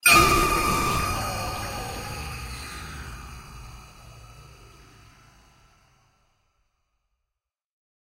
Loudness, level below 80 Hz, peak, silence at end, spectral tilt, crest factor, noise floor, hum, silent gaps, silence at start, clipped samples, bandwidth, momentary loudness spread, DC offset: -24 LUFS; -40 dBFS; -4 dBFS; 3.6 s; -3 dB/octave; 24 dB; -85 dBFS; none; none; 0.05 s; under 0.1%; 16 kHz; 27 LU; under 0.1%